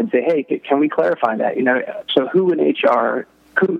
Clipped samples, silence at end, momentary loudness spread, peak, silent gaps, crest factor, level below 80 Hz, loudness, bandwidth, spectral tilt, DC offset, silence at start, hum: under 0.1%; 0 s; 5 LU; 0 dBFS; none; 18 dB; -72 dBFS; -18 LUFS; 5.6 kHz; -7.5 dB/octave; under 0.1%; 0 s; none